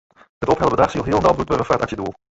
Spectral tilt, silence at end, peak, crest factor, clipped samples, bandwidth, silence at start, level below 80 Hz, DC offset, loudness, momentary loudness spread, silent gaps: -6.5 dB/octave; 0.2 s; -2 dBFS; 18 dB; under 0.1%; 8 kHz; 0.4 s; -40 dBFS; under 0.1%; -19 LUFS; 8 LU; none